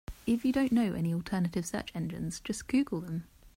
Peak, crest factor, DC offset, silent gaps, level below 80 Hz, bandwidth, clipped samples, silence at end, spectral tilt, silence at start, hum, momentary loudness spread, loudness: -18 dBFS; 14 dB; under 0.1%; none; -54 dBFS; 16 kHz; under 0.1%; 0.1 s; -6 dB/octave; 0.1 s; none; 10 LU; -32 LUFS